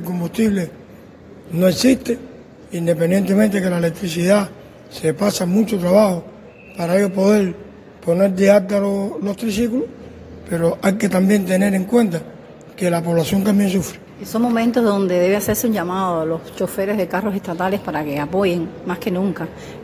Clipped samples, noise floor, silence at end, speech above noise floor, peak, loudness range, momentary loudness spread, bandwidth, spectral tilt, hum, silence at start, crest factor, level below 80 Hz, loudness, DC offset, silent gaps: under 0.1%; -41 dBFS; 0 s; 23 dB; 0 dBFS; 3 LU; 12 LU; 16 kHz; -6 dB/octave; none; 0 s; 18 dB; -48 dBFS; -18 LUFS; under 0.1%; none